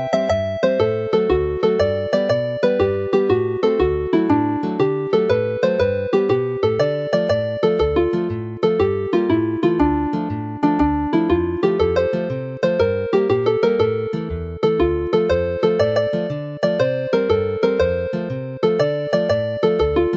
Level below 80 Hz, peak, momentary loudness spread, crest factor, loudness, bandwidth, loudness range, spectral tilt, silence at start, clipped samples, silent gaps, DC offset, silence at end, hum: -38 dBFS; -2 dBFS; 4 LU; 16 dB; -19 LUFS; 7.6 kHz; 1 LU; -7.5 dB/octave; 0 s; under 0.1%; none; under 0.1%; 0 s; none